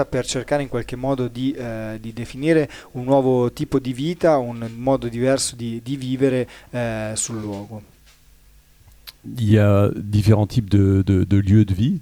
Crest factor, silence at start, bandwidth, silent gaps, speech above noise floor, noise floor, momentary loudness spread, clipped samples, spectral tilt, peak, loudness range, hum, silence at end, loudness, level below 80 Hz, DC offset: 18 dB; 0 s; 14.5 kHz; none; 32 dB; -51 dBFS; 13 LU; under 0.1%; -6.5 dB/octave; -2 dBFS; 7 LU; none; 0 s; -20 LUFS; -44 dBFS; under 0.1%